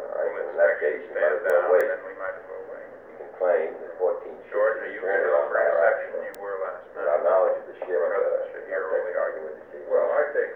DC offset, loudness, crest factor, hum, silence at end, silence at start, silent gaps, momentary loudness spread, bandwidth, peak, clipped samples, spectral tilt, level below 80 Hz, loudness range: under 0.1%; -25 LUFS; 18 dB; none; 0 s; 0 s; none; 15 LU; 3.8 kHz; -8 dBFS; under 0.1%; -5 dB/octave; -72 dBFS; 3 LU